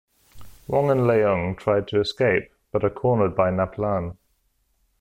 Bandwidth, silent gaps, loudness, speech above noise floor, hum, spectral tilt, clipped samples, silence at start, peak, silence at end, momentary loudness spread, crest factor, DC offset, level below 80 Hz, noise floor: 15.5 kHz; none; -22 LUFS; 47 dB; none; -7.5 dB/octave; under 0.1%; 0.35 s; -6 dBFS; 0.85 s; 7 LU; 16 dB; under 0.1%; -50 dBFS; -68 dBFS